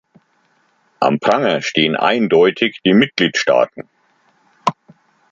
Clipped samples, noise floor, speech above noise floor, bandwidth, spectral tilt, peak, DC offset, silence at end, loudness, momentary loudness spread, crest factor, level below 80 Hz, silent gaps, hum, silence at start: under 0.1%; -60 dBFS; 45 dB; 7.6 kHz; -5 dB/octave; 0 dBFS; under 0.1%; 0.6 s; -15 LUFS; 9 LU; 16 dB; -60 dBFS; none; none; 1 s